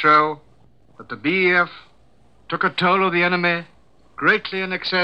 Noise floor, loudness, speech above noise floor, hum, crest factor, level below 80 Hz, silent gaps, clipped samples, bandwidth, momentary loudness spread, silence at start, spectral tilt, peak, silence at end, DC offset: -56 dBFS; -19 LUFS; 37 dB; none; 18 dB; -60 dBFS; none; under 0.1%; 8.4 kHz; 10 LU; 0 s; -6.5 dB/octave; -4 dBFS; 0 s; 0.2%